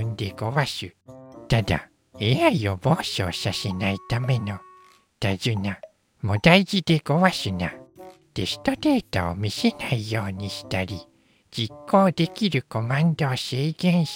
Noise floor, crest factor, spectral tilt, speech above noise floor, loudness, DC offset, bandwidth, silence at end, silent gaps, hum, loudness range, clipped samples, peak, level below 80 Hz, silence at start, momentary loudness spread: -54 dBFS; 22 dB; -6 dB/octave; 31 dB; -24 LUFS; under 0.1%; 17 kHz; 0 s; none; none; 4 LU; under 0.1%; -2 dBFS; -48 dBFS; 0 s; 12 LU